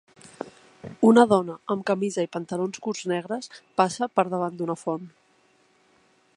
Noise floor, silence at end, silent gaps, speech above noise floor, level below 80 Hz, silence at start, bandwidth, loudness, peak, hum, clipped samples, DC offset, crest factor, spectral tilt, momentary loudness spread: -63 dBFS; 1.3 s; none; 39 dB; -70 dBFS; 0.25 s; 11 kHz; -24 LUFS; -2 dBFS; none; under 0.1%; under 0.1%; 24 dB; -5.5 dB/octave; 22 LU